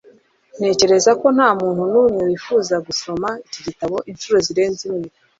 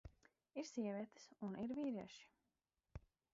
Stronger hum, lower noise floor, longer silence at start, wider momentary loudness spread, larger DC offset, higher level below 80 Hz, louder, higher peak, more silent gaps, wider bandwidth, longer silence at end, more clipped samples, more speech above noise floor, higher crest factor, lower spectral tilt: neither; second, -51 dBFS vs under -90 dBFS; first, 0.55 s vs 0.05 s; second, 12 LU vs 17 LU; neither; first, -56 dBFS vs -70 dBFS; first, -18 LUFS vs -48 LUFS; first, -2 dBFS vs -34 dBFS; neither; about the same, 7.8 kHz vs 7.6 kHz; about the same, 0.3 s vs 0.35 s; neither; second, 34 dB vs over 42 dB; about the same, 16 dB vs 16 dB; second, -4 dB/octave vs -6 dB/octave